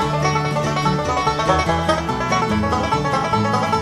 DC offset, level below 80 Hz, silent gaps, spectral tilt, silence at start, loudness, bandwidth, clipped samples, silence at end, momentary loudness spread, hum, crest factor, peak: under 0.1%; -36 dBFS; none; -5.5 dB/octave; 0 s; -19 LUFS; 13.5 kHz; under 0.1%; 0 s; 2 LU; none; 18 dB; -2 dBFS